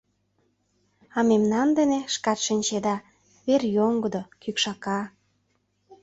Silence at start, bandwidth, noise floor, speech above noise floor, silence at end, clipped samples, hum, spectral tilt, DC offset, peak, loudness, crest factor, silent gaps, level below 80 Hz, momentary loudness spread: 1.15 s; 8 kHz; -71 dBFS; 47 dB; 0.1 s; under 0.1%; none; -4 dB/octave; under 0.1%; -8 dBFS; -25 LUFS; 18 dB; none; -66 dBFS; 11 LU